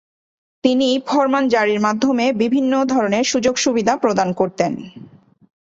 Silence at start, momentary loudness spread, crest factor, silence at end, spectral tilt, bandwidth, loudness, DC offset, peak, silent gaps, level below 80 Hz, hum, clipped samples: 0.65 s; 5 LU; 16 dB; 0.55 s; -4 dB/octave; 7.8 kHz; -17 LUFS; under 0.1%; -2 dBFS; none; -58 dBFS; none; under 0.1%